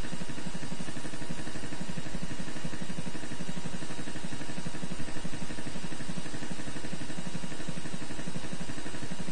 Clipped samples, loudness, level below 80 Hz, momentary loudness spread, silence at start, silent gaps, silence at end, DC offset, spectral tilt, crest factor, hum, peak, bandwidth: under 0.1%; -40 LUFS; -50 dBFS; 1 LU; 0 s; none; 0 s; 6%; -4.5 dB/octave; 16 dB; none; -16 dBFS; 10.5 kHz